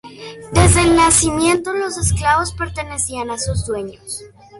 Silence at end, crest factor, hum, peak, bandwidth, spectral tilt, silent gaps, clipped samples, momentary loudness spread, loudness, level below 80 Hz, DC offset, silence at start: 0 s; 18 dB; none; 0 dBFS; 12 kHz; -4 dB/octave; none; under 0.1%; 18 LU; -16 LUFS; -28 dBFS; under 0.1%; 0.05 s